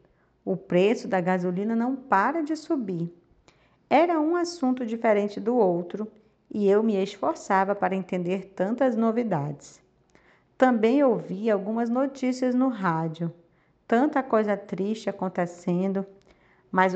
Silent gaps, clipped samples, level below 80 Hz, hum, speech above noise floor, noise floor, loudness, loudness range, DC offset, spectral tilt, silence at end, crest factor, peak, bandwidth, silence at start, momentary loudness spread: none; under 0.1%; -70 dBFS; none; 36 dB; -61 dBFS; -25 LUFS; 2 LU; under 0.1%; -7 dB/octave; 0 s; 20 dB; -6 dBFS; 8.4 kHz; 0.45 s; 10 LU